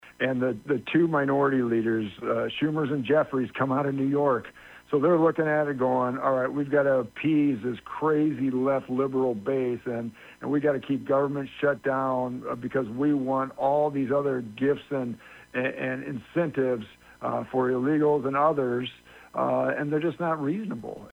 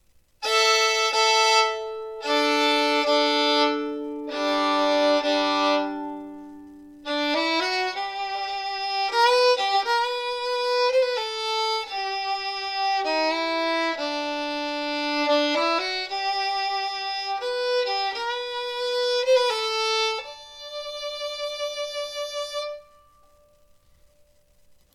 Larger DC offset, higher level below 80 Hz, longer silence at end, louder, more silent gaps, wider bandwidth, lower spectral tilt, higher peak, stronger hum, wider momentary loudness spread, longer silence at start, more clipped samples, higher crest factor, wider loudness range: neither; about the same, -64 dBFS vs -64 dBFS; second, 0 s vs 2.1 s; second, -26 LUFS vs -23 LUFS; neither; second, 10.5 kHz vs 16.5 kHz; first, -8.5 dB/octave vs -0.5 dB/octave; second, -10 dBFS vs -6 dBFS; neither; second, 8 LU vs 12 LU; second, 0.05 s vs 0.4 s; neither; about the same, 16 dB vs 18 dB; second, 3 LU vs 7 LU